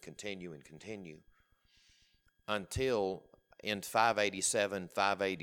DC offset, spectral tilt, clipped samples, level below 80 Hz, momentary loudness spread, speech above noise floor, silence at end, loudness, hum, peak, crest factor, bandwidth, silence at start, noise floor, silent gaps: under 0.1%; -3 dB/octave; under 0.1%; -62 dBFS; 18 LU; 36 dB; 0 s; -34 LUFS; none; -14 dBFS; 22 dB; 18.5 kHz; 0.05 s; -71 dBFS; none